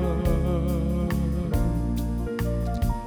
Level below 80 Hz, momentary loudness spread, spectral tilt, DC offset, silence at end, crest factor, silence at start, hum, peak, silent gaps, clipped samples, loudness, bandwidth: -28 dBFS; 3 LU; -8 dB/octave; under 0.1%; 0 s; 12 dB; 0 s; none; -12 dBFS; none; under 0.1%; -26 LUFS; over 20 kHz